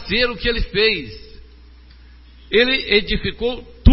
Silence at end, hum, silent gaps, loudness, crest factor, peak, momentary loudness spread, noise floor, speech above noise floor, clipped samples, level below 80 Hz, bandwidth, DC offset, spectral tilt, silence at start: 0 s; none; none; -18 LUFS; 20 dB; 0 dBFS; 9 LU; -44 dBFS; 25 dB; under 0.1%; -28 dBFS; 5.8 kHz; under 0.1%; -9.5 dB/octave; 0 s